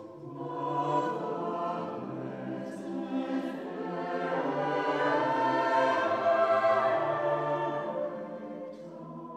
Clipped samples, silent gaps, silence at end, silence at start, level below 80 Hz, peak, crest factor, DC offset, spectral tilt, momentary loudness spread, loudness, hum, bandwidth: under 0.1%; none; 0 s; 0 s; -84 dBFS; -14 dBFS; 16 dB; under 0.1%; -6.5 dB/octave; 14 LU; -30 LUFS; none; 9.2 kHz